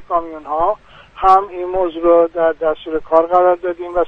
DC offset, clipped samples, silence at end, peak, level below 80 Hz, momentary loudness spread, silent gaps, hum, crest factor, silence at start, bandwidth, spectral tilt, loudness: under 0.1%; under 0.1%; 0 s; 0 dBFS; -42 dBFS; 9 LU; none; none; 16 dB; 0 s; 6 kHz; -7 dB/octave; -16 LUFS